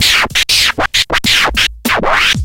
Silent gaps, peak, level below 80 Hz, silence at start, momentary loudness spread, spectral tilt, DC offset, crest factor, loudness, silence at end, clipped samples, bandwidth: none; 0 dBFS; -30 dBFS; 0 s; 4 LU; -1.5 dB/octave; under 0.1%; 12 dB; -10 LUFS; 0 s; under 0.1%; 17.5 kHz